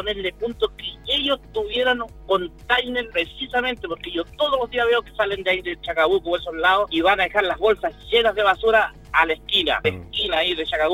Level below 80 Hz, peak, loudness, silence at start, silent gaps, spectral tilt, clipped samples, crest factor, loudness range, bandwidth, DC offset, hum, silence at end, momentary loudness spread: -44 dBFS; -2 dBFS; -21 LUFS; 0 s; none; -4.5 dB/octave; under 0.1%; 20 dB; 4 LU; 16.5 kHz; under 0.1%; none; 0 s; 7 LU